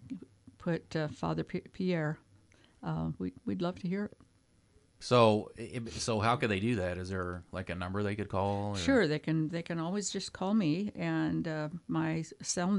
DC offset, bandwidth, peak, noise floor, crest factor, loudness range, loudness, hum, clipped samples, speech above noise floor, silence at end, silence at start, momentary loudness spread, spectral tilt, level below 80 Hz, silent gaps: under 0.1%; 11.5 kHz; -12 dBFS; -67 dBFS; 22 dB; 5 LU; -33 LUFS; none; under 0.1%; 35 dB; 0 s; 0 s; 12 LU; -5.5 dB/octave; -60 dBFS; none